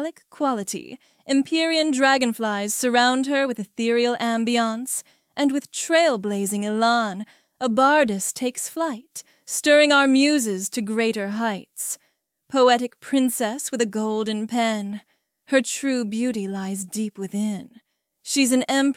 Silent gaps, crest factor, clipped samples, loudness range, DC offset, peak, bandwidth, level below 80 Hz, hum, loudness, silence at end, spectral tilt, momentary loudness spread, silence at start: none; 18 dB; under 0.1%; 5 LU; under 0.1%; -4 dBFS; 16.5 kHz; -72 dBFS; none; -22 LUFS; 0.05 s; -3 dB/octave; 11 LU; 0 s